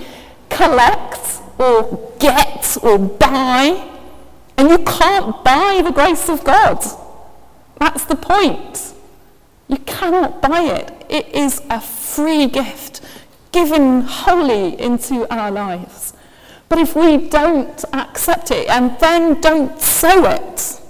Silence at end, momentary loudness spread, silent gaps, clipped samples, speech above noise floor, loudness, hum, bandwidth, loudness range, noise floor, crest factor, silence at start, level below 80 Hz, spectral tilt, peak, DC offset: 0 s; 13 LU; none; under 0.1%; 35 dB; -14 LUFS; none; 16 kHz; 5 LU; -48 dBFS; 14 dB; 0 s; -36 dBFS; -3.5 dB/octave; 0 dBFS; under 0.1%